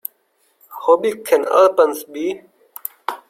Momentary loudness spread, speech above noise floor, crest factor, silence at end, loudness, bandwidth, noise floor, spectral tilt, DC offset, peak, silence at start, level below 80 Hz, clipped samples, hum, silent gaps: 19 LU; 47 dB; 18 dB; 0.1 s; -17 LUFS; 16.5 kHz; -63 dBFS; -3.5 dB/octave; under 0.1%; -2 dBFS; 0.7 s; -68 dBFS; under 0.1%; none; none